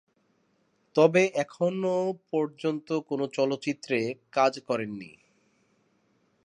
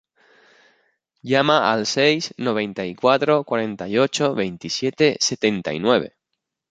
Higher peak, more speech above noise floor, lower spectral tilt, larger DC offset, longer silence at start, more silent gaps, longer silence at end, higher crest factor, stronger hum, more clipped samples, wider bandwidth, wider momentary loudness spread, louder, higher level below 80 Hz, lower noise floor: second, -6 dBFS vs -2 dBFS; second, 43 dB vs 60 dB; first, -5.5 dB/octave vs -4 dB/octave; neither; second, 0.95 s vs 1.25 s; neither; first, 1.35 s vs 0.65 s; about the same, 22 dB vs 20 dB; neither; neither; first, 10.5 kHz vs 9.4 kHz; first, 10 LU vs 7 LU; second, -27 LUFS vs -20 LUFS; second, -78 dBFS vs -62 dBFS; second, -70 dBFS vs -80 dBFS